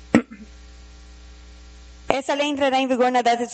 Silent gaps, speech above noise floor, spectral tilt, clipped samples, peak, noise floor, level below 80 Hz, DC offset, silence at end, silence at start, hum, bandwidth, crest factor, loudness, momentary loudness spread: none; 23 dB; -4.5 dB/octave; under 0.1%; 0 dBFS; -43 dBFS; -46 dBFS; under 0.1%; 0 s; 0 s; none; 8.8 kHz; 22 dB; -21 LUFS; 11 LU